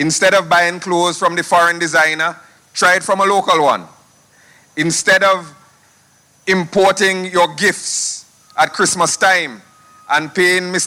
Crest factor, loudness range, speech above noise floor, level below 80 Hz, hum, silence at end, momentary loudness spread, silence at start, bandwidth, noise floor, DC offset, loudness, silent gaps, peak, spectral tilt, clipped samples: 14 dB; 3 LU; 38 dB; -60 dBFS; none; 0 s; 8 LU; 0 s; 16.5 kHz; -52 dBFS; under 0.1%; -14 LUFS; none; -2 dBFS; -2.5 dB/octave; under 0.1%